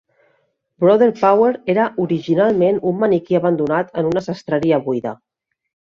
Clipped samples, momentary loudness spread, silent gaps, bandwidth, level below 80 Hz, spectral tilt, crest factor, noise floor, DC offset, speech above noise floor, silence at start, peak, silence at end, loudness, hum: under 0.1%; 8 LU; none; 7.2 kHz; -58 dBFS; -8 dB/octave; 16 dB; -64 dBFS; under 0.1%; 48 dB; 0.8 s; -2 dBFS; 0.8 s; -17 LUFS; none